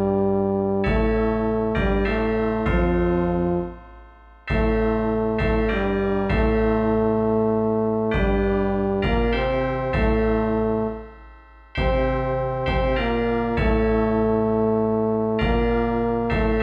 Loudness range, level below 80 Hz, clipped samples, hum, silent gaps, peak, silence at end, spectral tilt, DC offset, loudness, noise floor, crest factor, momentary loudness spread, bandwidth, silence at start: 2 LU; -30 dBFS; under 0.1%; none; none; -10 dBFS; 0 s; -9 dB/octave; under 0.1%; -22 LUFS; -46 dBFS; 12 dB; 3 LU; 5.2 kHz; 0 s